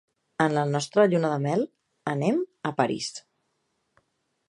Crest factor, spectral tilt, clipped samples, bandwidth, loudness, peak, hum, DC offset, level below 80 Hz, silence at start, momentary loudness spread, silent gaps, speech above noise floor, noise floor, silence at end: 20 dB; -6 dB/octave; under 0.1%; 11.5 kHz; -26 LUFS; -6 dBFS; none; under 0.1%; -70 dBFS; 0.4 s; 13 LU; none; 51 dB; -75 dBFS; 1.3 s